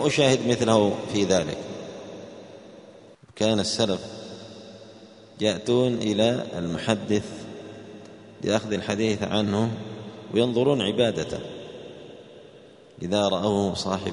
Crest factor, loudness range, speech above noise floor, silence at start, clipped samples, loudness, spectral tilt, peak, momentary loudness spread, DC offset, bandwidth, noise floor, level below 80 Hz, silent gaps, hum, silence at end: 22 dB; 4 LU; 26 dB; 0 s; under 0.1%; -24 LUFS; -5 dB/octave; -4 dBFS; 21 LU; under 0.1%; 10.5 kHz; -49 dBFS; -58 dBFS; none; none; 0 s